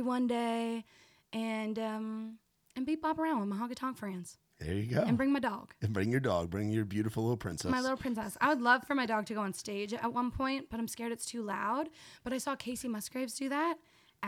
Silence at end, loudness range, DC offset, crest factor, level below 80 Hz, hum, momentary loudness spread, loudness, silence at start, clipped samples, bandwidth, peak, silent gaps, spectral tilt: 0 s; 5 LU; under 0.1%; 20 dB; -60 dBFS; none; 11 LU; -34 LUFS; 0 s; under 0.1%; 17 kHz; -14 dBFS; none; -5.5 dB/octave